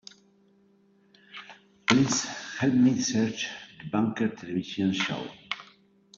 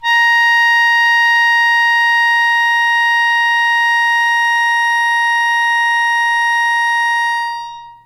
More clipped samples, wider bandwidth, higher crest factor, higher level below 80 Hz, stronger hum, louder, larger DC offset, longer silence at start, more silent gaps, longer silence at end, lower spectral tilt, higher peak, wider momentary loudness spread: neither; second, 7.8 kHz vs 16 kHz; first, 24 dB vs 8 dB; about the same, -66 dBFS vs -62 dBFS; neither; second, -27 LUFS vs -11 LUFS; neither; first, 1.35 s vs 0 s; neither; first, 0.55 s vs 0.15 s; first, -4 dB/octave vs 4.5 dB/octave; about the same, -6 dBFS vs -4 dBFS; first, 17 LU vs 4 LU